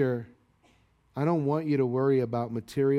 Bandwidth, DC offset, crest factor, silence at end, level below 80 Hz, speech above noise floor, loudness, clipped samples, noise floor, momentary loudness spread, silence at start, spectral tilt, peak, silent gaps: 13.5 kHz; under 0.1%; 14 dB; 0 s; -66 dBFS; 38 dB; -28 LUFS; under 0.1%; -64 dBFS; 8 LU; 0 s; -9 dB/octave; -14 dBFS; none